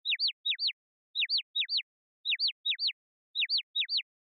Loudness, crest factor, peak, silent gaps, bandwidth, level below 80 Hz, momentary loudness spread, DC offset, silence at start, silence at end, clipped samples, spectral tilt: -30 LUFS; 12 dB; -22 dBFS; 0.33-0.44 s, 0.73-1.14 s, 1.43-1.54 s, 1.83-2.24 s, 2.52-2.64 s, 2.93-3.34 s, 3.63-3.74 s; 5.4 kHz; under -90 dBFS; 9 LU; under 0.1%; 0.05 s; 0.35 s; under 0.1%; 15 dB/octave